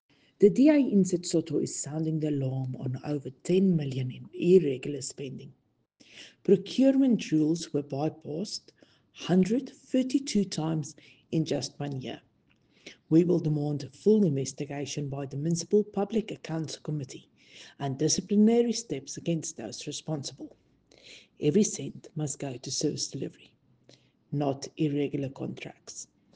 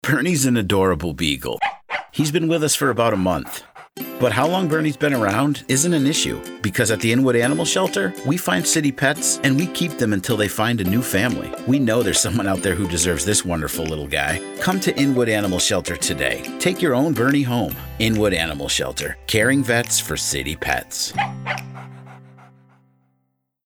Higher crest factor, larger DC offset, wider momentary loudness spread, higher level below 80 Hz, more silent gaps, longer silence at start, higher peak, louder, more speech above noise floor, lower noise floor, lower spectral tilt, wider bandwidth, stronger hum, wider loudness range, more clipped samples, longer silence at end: about the same, 20 dB vs 18 dB; neither; first, 15 LU vs 7 LU; second, -68 dBFS vs -44 dBFS; neither; first, 0.4 s vs 0.05 s; second, -8 dBFS vs -2 dBFS; second, -28 LUFS vs -20 LUFS; second, 39 dB vs 51 dB; second, -67 dBFS vs -71 dBFS; first, -6 dB/octave vs -4 dB/octave; second, 10 kHz vs over 20 kHz; neither; first, 5 LU vs 2 LU; neither; second, 0.3 s vs 1.45 s